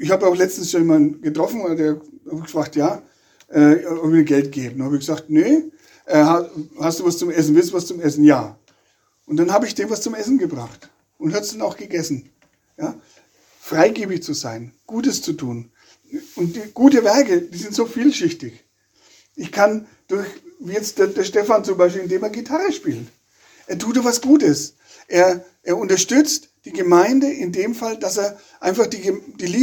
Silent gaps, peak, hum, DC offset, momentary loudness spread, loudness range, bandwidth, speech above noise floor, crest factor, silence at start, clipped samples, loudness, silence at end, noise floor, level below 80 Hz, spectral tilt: none; 0 dBFS; none; under 0.1%; 15 LU; 6 LU; 19 kHz; 45 dB; 18 dB; 0 s; under 0.1%; -18 LUFS; 0 s; -62 dBFS; -66 dBFS; -5 dB/octave